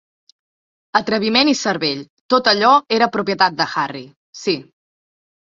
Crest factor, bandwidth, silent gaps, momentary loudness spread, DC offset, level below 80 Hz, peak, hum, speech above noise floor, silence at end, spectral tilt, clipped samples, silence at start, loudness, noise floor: 18 dB; 7.8 kHz; 2.10-2.29 s, 4.16-4.33 s; 12 LU; under 0.1%; -62 dBFS; 0 dBFS; none; over 73 dB; 0.95 s; -3.5 dB/octave; under 0.1%; 0.95 s; -17 LUFS; under -90 dBFS